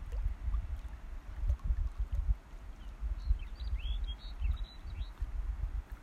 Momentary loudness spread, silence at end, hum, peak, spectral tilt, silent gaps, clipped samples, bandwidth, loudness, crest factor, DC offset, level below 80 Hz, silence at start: 9 LU; 0 s; none; -20 dBFS; -6.5 dB/octave; none; under 0.1%; 6.6 kHz; -41 LUFS; 16 dB; under 0.1%; -36 dBFS; 0 s